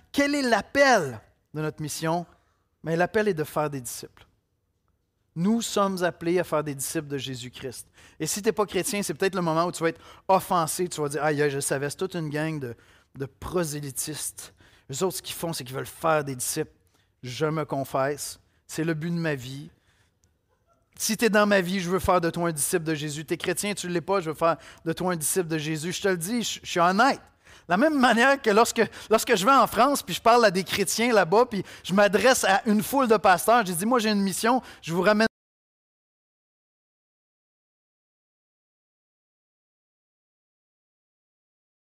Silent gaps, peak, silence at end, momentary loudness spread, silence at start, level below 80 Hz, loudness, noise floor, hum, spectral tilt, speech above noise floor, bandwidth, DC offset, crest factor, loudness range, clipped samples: none; -10 dBFS; 6.7 s; 14 LU; 0.15 s; -58 dBFS; -24 LUFS; -73 dBFS; none; -4 dB/octave; 49 dB; 16 kHz; under 0.1%; 16 dB; 9 LU; under 0.1%